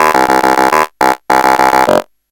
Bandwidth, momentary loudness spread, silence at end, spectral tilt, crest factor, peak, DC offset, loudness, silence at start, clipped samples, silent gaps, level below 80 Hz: over 20 kHz; 4 LU; 0.3 s; -3.5 dB/octave; 10 dB; 0 dBFS; under 0.1%; -10 LUFS; 0 s; 1%; none; -42 dBFS